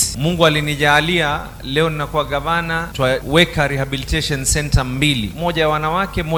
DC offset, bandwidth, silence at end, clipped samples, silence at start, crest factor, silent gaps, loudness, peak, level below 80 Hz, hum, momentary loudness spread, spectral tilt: under 0.1%; 17.5 kHz; 0 s; under 0.1%; 0 s; 18 dB; none; -17 LUFS; 0 dBFS; -30 dBFS; none; 7 LU; -4 dB/octave